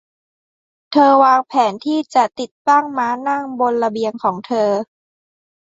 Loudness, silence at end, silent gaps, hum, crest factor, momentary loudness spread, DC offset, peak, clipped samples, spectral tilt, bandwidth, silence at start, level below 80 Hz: -16 LUFS; 0.85 s; 2.51-2.65 s; none; 16 dB; 9 LU; under 0.1%; 0 dBFS; under 0.1%; -5 dB/octave; 7.8 kHz; 0.9 s; -68 dBFS